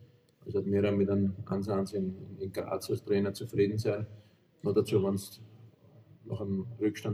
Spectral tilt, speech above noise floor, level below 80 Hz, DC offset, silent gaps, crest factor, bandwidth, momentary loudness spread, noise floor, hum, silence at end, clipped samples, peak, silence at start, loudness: -7.5 dB/octave; 27 dB; -68 dBFS; under 0.1%; none; 18 dB; 15.5 kHz; 11 LU; -58 dBFS; none; 0 s; under 0.1%; -14 dBFS; 0 s; -32 LUFS